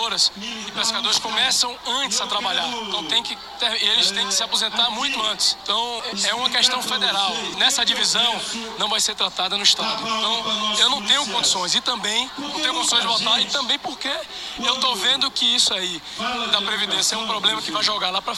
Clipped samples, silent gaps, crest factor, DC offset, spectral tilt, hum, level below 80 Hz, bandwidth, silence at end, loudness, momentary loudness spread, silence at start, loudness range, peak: under 0.1%; none; 20 dB; under 0.1%; 0 dB/octave; none; -58 dBFS; 16 kHz; 0 s; -19 LUFS; 7 LU; 0 s; 2 LU; -2 dBFS